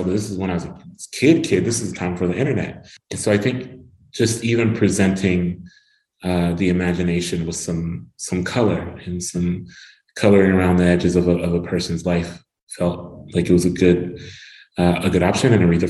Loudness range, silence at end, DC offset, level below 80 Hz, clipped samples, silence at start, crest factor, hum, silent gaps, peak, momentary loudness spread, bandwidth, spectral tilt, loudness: 4 LU; 0 s; under 0.1%; -44 dBFS; under 0.1%; 0 s; 18 dB; none; 12.63-12.67 s; 0 dBFS; 16 LU; 12.5 kHz; -6 dB/octave; -19 LUFS